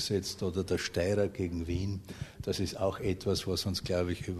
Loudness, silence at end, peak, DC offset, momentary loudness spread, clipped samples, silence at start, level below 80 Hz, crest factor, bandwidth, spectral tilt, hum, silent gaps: -33 LUFS; 0 s; -16 dBFS; under 0.1%; 6 LU; under 0.1%; 0 s; -50 dBFS; 16 dB; 13.5 kHz; -5 dB/octave; none; none